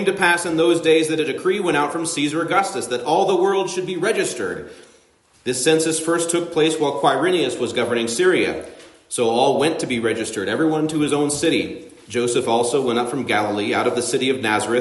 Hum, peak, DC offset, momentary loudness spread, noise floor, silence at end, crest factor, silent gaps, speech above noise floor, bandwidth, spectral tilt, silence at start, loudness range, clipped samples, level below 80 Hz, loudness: none; -4 dBFS; under 0.1%; 7 LU; -56 dBFS; 0 s; 16 dB; none; 36 dB; 11.5 kHz; -3.5 dB/octave; 0 s; 2 LU; under 0.1%; -60 dBFS; -19 LUFS